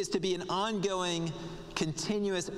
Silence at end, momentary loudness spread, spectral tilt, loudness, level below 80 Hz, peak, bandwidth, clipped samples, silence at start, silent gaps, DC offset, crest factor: 0 s; 7 LU; -4 dB/octave; -33 LUFS; -56 dBFS; -12 dBFS; 14 kHz; under 0.1%; 0 s; none; under 0.1%; 20 dB